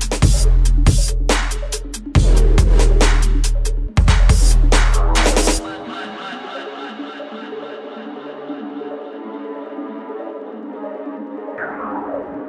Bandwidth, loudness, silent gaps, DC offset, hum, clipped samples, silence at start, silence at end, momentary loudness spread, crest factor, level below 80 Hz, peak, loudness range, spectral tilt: 11 kHz; -19 LUFS; none; under 0.1%; none; under 0.1%; 0 s; 0 s; 15 LU; 14 dB; -16 dBFS; -2 dBFS; 14 LU; -4.5 dB/octave